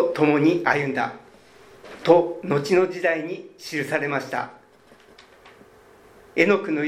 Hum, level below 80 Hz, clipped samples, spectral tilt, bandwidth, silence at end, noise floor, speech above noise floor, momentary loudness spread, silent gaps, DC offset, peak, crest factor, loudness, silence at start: none; -66 dBFS; under 0.1%; -6 dB/octave; 15 kHz; 0 s; -53 dBFS; 31 dB; 12 LU; none; under 0.1%; -2 dBFS; 22 dB; -22 LUFS; 0 s